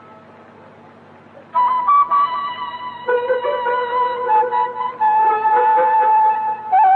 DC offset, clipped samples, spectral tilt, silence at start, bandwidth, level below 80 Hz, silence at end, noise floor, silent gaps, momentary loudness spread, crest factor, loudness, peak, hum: under 0.1%; under 0.1%; -5.5 dB/octave; 1.35 s; 4.4 kHz; -76 dBFS; 0 s; -43 dBFS; none; 9 LU; 10 dB; -17 LUFS; -6 dBFS; none